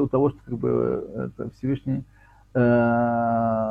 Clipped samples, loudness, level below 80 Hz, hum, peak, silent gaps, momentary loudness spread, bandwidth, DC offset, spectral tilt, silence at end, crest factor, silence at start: under 0.1%; -24 LUFS; -50 dBFS; none; -8 dBFS; none; 11 LU; 5 kHz; under 0.1%; -10.5 dB/octave; 0 s; 16 dB; 0 s